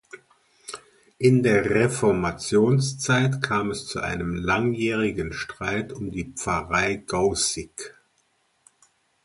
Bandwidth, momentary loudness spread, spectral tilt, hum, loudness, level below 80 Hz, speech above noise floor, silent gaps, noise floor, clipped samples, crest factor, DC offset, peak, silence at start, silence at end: 11.5 kHz; 15 LU; -5 dB/octave; none; -23 LUFS; -48 dBFS; 45 dB; none; -68 dBFS; under 0.1%; 18 dB; under 0.1%; -6 dBFS; 0.15 s; 1.35 s